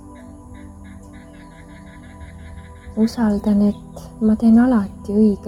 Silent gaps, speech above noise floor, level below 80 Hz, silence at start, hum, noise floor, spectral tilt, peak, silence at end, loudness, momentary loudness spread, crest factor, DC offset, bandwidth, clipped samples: none; 24 dB; -42 dBFS; 0.05 s; none; -40 dBFS; -8 dB/octave; -6 dBFS; 0 s; -17 LUFS; 26 LU; 14 dB; under 0.1%; 11.5 kHz; under 0.1%